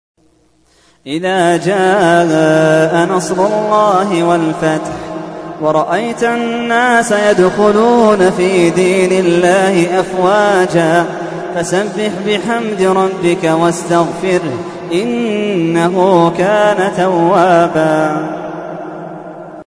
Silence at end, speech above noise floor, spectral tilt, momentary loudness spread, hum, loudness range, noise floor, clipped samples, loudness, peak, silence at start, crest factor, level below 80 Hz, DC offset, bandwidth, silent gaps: 0.05 s; 41 dB; -5.5 dB/octave; 12 LU; none; 4 LU; -53 dBFS; under 0.1%; -12 LUFS; 0 dBFS; 1.05 s; 12 dB; -50 dBFS; under 0.1%; 11 kHz; none